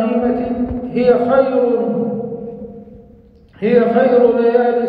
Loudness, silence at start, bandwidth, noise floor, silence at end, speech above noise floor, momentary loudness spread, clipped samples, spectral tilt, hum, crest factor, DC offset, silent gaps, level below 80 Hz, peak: -15 LUFS; 0 s; 4.9 kHz; -44 dBFS; 0 s; 32 dB; 15 LU; under 0.1%; -10 dB/octave; none; 14 dB; under 0.1%; none; -44 dBFS; -2 dBFS